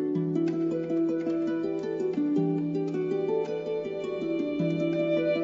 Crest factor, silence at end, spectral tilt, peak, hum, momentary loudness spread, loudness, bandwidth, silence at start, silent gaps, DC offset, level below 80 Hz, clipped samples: 12 dB; 0 s; -8.5 dB/octave; -16 dBFS; none; 5 LU; -29 LUFS; 7.4 kHz; 0 s; none; under 0.1%; -68 dBFS; under 0.1%